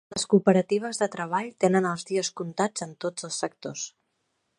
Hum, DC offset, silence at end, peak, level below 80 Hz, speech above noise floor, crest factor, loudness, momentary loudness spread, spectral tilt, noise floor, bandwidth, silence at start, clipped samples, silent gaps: none; under 0.1%; 0.7 s; -4 dBFS; -70 dBFS; 50 dB; 22 dB; -26 LUFS; 12 LU; -4.5 dB/octave; -76 dBFS; 11.5 kHz; 0.1 s; under 0.1%; none